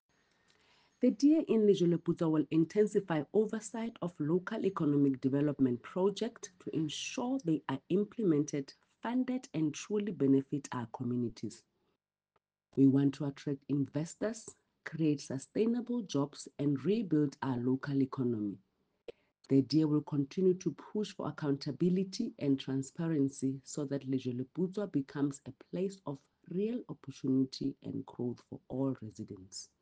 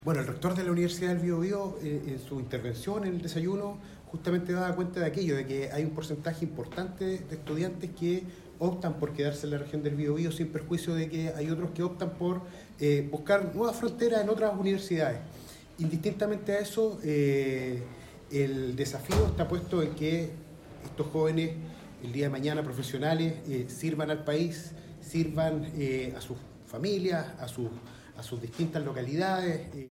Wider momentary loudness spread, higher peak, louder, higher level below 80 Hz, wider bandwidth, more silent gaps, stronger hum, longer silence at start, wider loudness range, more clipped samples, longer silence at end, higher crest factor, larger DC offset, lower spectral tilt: about the same, 13 LU vs 11 LU; second, -16 dBFS vs -12 dBFS; about the same, -34 LUFS vs -32 LUFS; second, -74 dBFS vs -52 dBFS; second, 9.4 kHz vs 16 kHz; neither; neither; first, 1 s vs 0 s; about the same, 6 LU vs 4 LU; neither; about the same, 0.15 s vs 0.05 s; about the same, 18 dB vs 18 dB; neither; about the same, -7 dB/octave vs -6.5 dB/octave